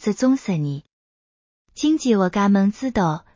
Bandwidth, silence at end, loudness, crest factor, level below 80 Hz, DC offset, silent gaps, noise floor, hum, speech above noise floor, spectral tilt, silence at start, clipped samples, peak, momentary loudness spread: 7.6 kHz; 0.15 s; -20 LUFS; 14 dB; -52 dBFS; under 0.1%; 0.93-1.65 s; under -90 dBFS; none; over 71 dB; -6.5 dB/octave; 0 s; under 0.1%; -6 dBFS; 7 LU